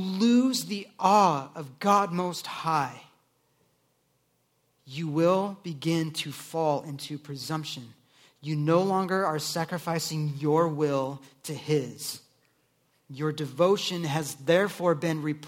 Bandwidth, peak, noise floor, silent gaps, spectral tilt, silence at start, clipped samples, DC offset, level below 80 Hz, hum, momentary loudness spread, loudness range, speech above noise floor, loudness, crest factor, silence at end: 17 kHz; -6 dBFS; -71 dBFS; none; -5.5 dB/octave; 0 s; under 0.1%; under 0.1%; -74 dBFS; none; 14 LU; 4 LU; 44 dB; -27 LUFS; 22 dB; 0 s